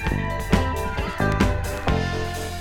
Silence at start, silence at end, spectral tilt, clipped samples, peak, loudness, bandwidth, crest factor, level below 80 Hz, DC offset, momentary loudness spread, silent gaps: 0 s; 0 s; -6 dB/octave; under 0.1%; -2 dBFS; -24 LUFS; 18 kHz; 20 dB; -30 dBFS; under 0.1%; 6 LU; none